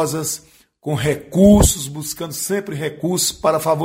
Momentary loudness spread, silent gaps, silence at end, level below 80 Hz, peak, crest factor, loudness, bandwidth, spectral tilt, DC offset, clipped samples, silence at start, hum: 14 LU; none; 0 s; -32 dBFS; 0 dBFS; 18 dB; -18 LUFS; 16.5 kHz; -5 dB/octave; under 0.1%; under 0.1%; 0 s; none